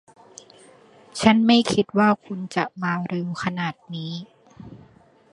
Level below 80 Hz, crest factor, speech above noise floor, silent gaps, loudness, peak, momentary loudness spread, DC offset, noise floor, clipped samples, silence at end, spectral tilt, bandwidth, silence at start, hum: -58 dBFS; 22 dB; 32 dB; none; -22 LUFS; 0 dBFS; 16 LU; under 0.1%; -54 dBFS; under 0.1%; 0.55 s; -5.5 dB/octave; 11.5 kHz; 1.15 s; none